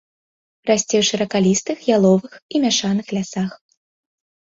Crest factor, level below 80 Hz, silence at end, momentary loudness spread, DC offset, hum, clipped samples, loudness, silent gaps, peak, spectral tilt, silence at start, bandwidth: 18 dB; -60 dBFS; 1.05 s; 9 LU; under 0.1%; none; under 0.1%; -19 LUFS; 2.42-2.49 s; -2 dBFS; -4.5 dB/octave; 0.65 s; 7.8 kHz